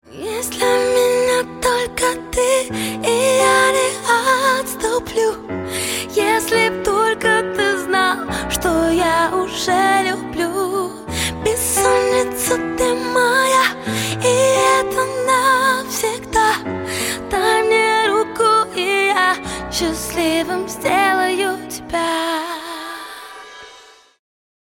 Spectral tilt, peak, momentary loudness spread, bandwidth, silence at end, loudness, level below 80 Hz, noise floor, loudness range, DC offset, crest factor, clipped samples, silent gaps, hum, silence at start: -2.5 dB/octave; -2 dBFS; 9 LU; 17 kHz; 0.9 s; -17 LUFS; -42 dBFS; -45 dBFS; 3 LU; under 0.1%; 16 dB; under 0.1%; none; none; 0.1 s